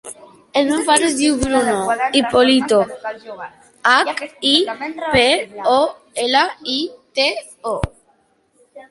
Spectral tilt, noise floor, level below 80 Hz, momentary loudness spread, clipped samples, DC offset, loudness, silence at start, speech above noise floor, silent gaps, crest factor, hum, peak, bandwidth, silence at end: -3 dB/octave; -59 dBFS; -42 dBFS; 14 LU; under 0.1%; under 0.1%; -17 LUFS; 0.05 s; 42 dB; none; 18 dB; none; 0 dBFS; 11.5 kHz; 0.1 s